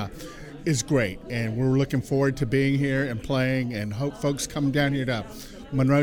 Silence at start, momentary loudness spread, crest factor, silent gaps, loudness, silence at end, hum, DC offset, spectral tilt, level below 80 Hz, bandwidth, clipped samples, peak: 0 s; 9 LU; 18 dB; none; -25 LUFS; 0 s; none; under 0.1%; -6 dB/octave; -46 dBFS; 16.5 kHz; under 0.1%; -6 dBFS